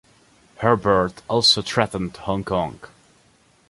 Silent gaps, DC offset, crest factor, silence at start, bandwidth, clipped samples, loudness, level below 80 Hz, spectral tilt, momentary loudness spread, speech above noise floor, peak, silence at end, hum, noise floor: none; under 0.1%; 20 dB; 0.6 s; 11.5 kHz; under 0.1%; -20 LUFS; -48 dBFS; -4 dB/octave; 11 LU; 37 dB; -2 dBFS; 0.85 s; none; -58 dBFS